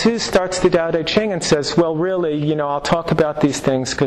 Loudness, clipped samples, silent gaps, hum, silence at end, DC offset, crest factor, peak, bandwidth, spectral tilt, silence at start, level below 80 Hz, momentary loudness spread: -18 LUFS; under 0.1%; none; none; 0 s; under 0.1%; 14 dB; -4 dBFS; 13 kHz; -5 dB/octave; 0 s; -44 dBFS; 3 LU